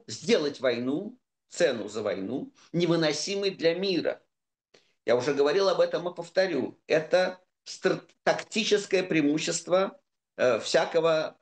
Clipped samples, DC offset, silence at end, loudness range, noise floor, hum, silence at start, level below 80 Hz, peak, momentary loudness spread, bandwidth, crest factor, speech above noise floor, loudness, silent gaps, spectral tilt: under 0.1%; under 0.1%; 0.1 s; 2 LU; -67 dBFS; none; 0.1 s; -78 dBFS; -10 dBFS; 10 LU; 9.6 kHz; 18 dB; 41 dB; -27 LUFS; none; -4 dB/octave